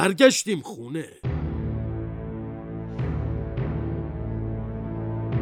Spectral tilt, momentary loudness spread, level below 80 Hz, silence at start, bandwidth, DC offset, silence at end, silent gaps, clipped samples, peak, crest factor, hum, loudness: -5 dB/octave; 12 LU; -38 dBFS; 0 s; 16 kHz; under 0.1%; 0 s; none; under 0.1%; -2 dBFS; 24 dB; none; -27 LUFS